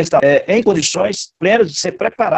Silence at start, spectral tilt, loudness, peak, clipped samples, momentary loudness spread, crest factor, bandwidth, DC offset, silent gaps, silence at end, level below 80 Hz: 0 s; -4 dB/octave; -14 LUFS; -2 dBFS; under 0.1%; 6 LU; 14 dB; 8.6 kHz; under 0.1%; none; 0 s; -52 dBFS